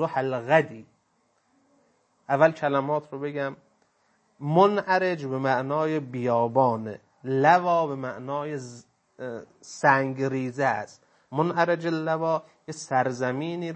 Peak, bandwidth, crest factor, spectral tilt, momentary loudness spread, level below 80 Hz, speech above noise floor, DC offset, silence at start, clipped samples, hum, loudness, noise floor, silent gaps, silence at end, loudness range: -4 dBFS; 8.8 kHz; 22 dB; -6.5 dB/octave; 16 LU; -76 dBFS; 44 dB; under 0.1%; 0 s; under 0.1%; none; -25 LUFS; -69 dBFS; none; 0 s; 4 LU